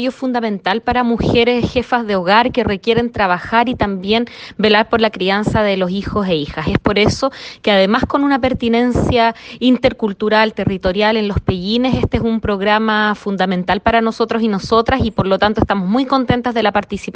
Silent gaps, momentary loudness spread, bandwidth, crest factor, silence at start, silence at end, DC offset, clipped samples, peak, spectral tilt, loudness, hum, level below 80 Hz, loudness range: none; 5 LU; 9 kHz; 16 dB; 0 s; 0.05 s; under 0.1%; under 0.1%; 0 dBFS; -6 dB/octave; -15 LUFS; none; -36 dBFS; 1 LU